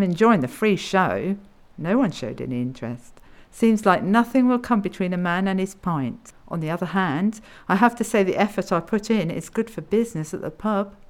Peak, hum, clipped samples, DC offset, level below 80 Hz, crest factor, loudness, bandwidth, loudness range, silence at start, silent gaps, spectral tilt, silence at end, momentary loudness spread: -4 dBFS; none; under 0.1%; under 0.1%; -52 dBFS; 20 dB; -22 LUFS; 16 kHz; 3 LU; 0 s; none; -6.5 dB/octave; 0.15 s; 12 LU